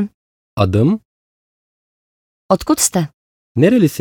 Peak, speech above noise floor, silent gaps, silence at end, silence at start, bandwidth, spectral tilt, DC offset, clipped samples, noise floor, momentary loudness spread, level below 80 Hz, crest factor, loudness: 0 dBFS; over 76 dB; 0.14-0.57 s, 1.05-2.49 s, 3.14-3.55 s; 0 s; 0 s; 19 kHz; -5.5 dB/octave; under 0.1%; under 0.1%; under -90 dBFS; 13 LU; -48 dBFS; 18 dB; -16 LUFS